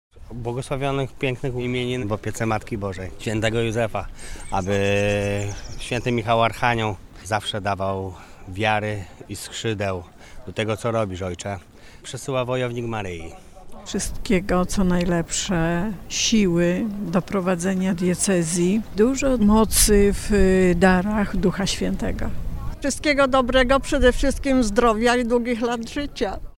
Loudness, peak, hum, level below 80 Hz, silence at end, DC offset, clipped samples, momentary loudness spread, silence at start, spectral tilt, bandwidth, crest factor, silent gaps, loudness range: -22 LUFS; -2 dBFS; none; -34 dBFS; 0.1 s; under 0.1%; under 0.1%; 14 LU; 0.15 s; -4.5 dB/octave; 16.5 kHz; 18 dB; none; 8 LU